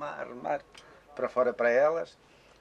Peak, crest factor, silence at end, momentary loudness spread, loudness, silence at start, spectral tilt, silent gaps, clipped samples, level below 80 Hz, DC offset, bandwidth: -14 dBFS; 16 dB; 0.5 s; 14 LU; -29 LUFS; 0 s; -5.5 dB/octave; none; under 0.1%; -70 dBFS; under 0.1%; 9.2 kHz